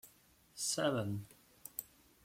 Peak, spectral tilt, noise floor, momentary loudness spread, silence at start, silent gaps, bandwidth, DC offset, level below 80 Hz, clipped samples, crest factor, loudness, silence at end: -22 dBFS; -3.5 dB/octave; -67 dBFS; 20 LU; 0.05 s; none; 16.5 kHz; under 0.1%; -74 dBFS; under 0.1%; 20 dB; -39 LUFS; 0.4 s